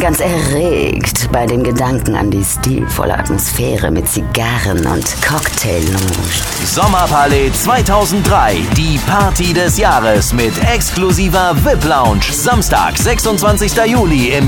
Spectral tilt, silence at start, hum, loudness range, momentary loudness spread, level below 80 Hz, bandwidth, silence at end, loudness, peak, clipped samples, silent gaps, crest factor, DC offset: -4.5 dB/octave; 0 s; none; 3 LU; 4 LU; -22 dBFS; 19 kHz; 0 s; -12 LUFS; 0 dBFS; under 0.1%; none; 12 dB; under 0.1%